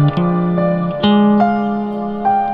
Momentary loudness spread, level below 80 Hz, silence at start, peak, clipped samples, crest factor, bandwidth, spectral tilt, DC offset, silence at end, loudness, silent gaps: 8 LU; -46 dBFS; 0 s; 0 dBFS; under 0.1%; 14 dB; 5.4 kHz; -10 dB/octave; under 0.1%; 0 s; -15 LUFS; none